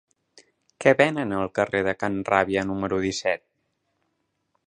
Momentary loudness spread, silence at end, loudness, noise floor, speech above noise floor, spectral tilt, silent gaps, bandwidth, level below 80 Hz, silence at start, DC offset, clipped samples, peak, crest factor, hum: 7 LU; 1.3 s; -24 LUFS; -75 dBFS; 52 dB; -5 dB/octave; none; 10 kHz; -56 dBFS; 0.8 s; under 0.1%; under 0.1%; -2 dBFS; 24 dB; none